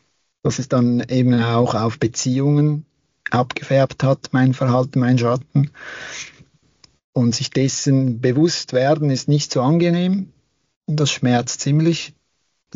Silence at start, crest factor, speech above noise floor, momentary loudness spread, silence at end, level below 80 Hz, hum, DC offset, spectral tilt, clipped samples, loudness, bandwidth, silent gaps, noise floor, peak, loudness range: 0.45 s; 14 dB; 52 dB; 10 LU; 0.65 s; -58 dBFS; none; under 0.1%; -6.5 dB/octave; under 0.1%; -18 LUFS; 7.6 kHz; 7.04-7.13 s, 10.76-10.81 s; -70 dBFS; -4 dBFS; 3 LU